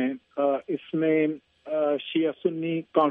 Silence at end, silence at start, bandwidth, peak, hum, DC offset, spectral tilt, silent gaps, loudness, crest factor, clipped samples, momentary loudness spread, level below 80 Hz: 0 s; 0 s; 3.9 kHz; -8 dBFS; none; under 0.1%; -9.5 dB/octave; none; -27 LUFS; 18 dB; under 0.1%; 6 LU; -74 dBFS